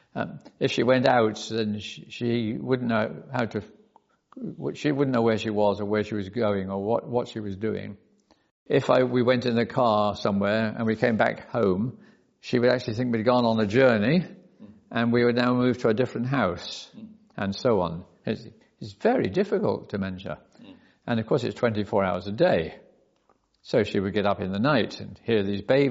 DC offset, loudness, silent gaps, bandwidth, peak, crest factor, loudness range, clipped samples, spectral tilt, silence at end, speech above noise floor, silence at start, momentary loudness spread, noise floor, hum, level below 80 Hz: under 0.1%; -25 LUFS; 8.51-8.66 s; 7.6 kHz; -6 dBFS; 20 dB; 5 LU; under 0.1%; -5 dB/octave; 0 s; 42 dB; 0.15 s; 13 LU; -67 dBFS; none; -62 dBFS